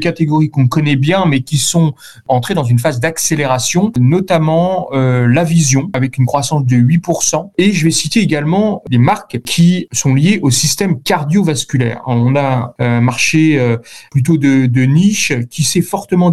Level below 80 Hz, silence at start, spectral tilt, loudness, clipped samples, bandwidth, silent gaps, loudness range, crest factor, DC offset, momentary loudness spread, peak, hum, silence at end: -48 dBFS; 0 s; -5 dB/octave; -13 LUFS; under 0.1%; 13 kHz; none; 1 LU; 12 dB; 1%; 5 LU; 0 dBFS; none; 0 s